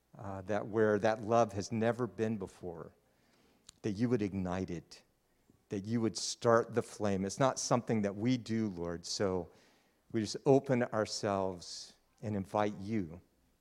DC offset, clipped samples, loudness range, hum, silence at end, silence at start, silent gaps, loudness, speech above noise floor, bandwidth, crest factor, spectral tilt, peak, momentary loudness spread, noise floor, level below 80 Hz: under 0.1%; under 0.1%; 5 LU; none; 0.4 s; 0.15 s; none; -34 LUFS; 37 dB; 13 kHz; 22 dB; -5.5 dB/octave; -12 dBFS; 15 LU; -70 dBFS; -68 dBFS